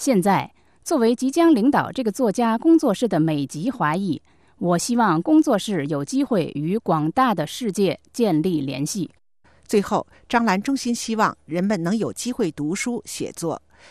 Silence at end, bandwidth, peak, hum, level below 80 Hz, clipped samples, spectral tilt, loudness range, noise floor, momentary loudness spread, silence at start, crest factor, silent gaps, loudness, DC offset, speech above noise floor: 0.35 s; 13.5 kHz; -4 dBFS; none; -58 dBFS; under 0.1%; -5.5 dB/octave; 4 LU; -58 dBFS; 10 LU; 0 s; 16 dB; none; -21 LUFS; 0.1%; 37 dB